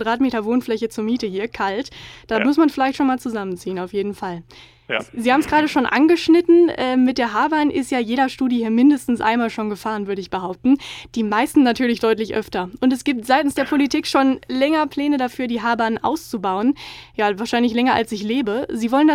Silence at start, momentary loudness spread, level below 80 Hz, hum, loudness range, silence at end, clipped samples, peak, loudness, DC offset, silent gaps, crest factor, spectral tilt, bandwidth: 0 s; 10 LU; -52 dBFS; none; 4 LU; 0 s; under 0.1%; -2 dBFS; -19 LUFS; under 0.1%; none; 16 dB; -5 dB/octave; 15.5 kHz